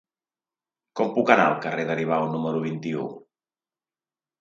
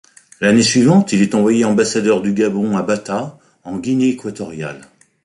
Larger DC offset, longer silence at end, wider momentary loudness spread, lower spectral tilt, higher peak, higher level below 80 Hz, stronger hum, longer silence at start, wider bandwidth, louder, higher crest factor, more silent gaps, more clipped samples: neither; first, 1.2 s vs 0.4 s; second, 12 LU vs 15 LU; first, -6.5 dB/octave vs -5 dB/octave; about the same, -2 dBFS vs -2 dBFS; second, -74 dBFS vs -54 dBFS; neither; first, 0.95 s vs 0.4 s; second, 7.6 kHz vs 11.5 kHz; second, -24 LUFS vs -15 LUFS; first, 24 dB vs 14 dB; neither; neither